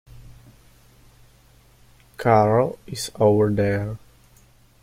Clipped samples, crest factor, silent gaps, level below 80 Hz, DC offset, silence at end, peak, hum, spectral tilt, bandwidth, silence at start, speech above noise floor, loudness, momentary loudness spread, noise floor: under 0.1%; 20 dB; none; -50 dBFS; under 0.1%; 0.85 s; -4 dBFS; none; -6.5 dB/octave; 15.5 kHz; 0.15 s; 35 dB; -21 LUFS; 14 LU; -54 dBFS